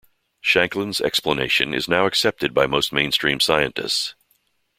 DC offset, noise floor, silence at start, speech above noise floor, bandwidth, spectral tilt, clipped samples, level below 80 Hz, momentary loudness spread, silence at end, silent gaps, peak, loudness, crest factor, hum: under 0.1%; -66 dBFS; 0.45 s; 45 dB; 16.5 kHz; -3 dB/octave; under 0.1%; -52 dBFS; 5 LU; 0.65 s; none; -2 dBFS; -19 LUFS; 20 dB; none